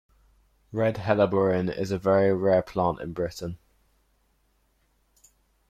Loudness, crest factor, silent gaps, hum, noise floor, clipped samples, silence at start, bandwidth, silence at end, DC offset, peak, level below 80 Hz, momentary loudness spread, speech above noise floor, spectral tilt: -25 LUFS; 18 dB; none; none; -68 dBFS; under 0.1%; 0.7 s; 14.5 kHz; 2.15 s; under 0.1%; -8 dBFS; -56 dBFS; 14 LU; 44 dB; -7.5 dB/octave